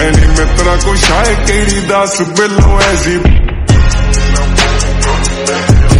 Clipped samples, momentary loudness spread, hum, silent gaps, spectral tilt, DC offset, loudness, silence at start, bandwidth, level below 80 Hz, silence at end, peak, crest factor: 0.3%; 4 LU; none; none; -4.5 dB/octave; under 0.1%; -10 LUFS; 0 s; 11.5 kHz; -10 dBFS; 0 s; 0 dBFS; 8 dB